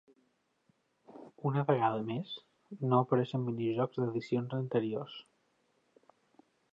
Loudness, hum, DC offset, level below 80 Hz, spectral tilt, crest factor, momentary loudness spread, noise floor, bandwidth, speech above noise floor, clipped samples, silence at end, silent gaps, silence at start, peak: -33 LUFS; none; under 0.1%; -80 dBFS; -9 dB/octave; 20 dB; 17 LU; -75 dBFS; 7.6 kHz; 43 dB; under 0.1%; 1.5 s; none; 1.1 s; -14 dBFS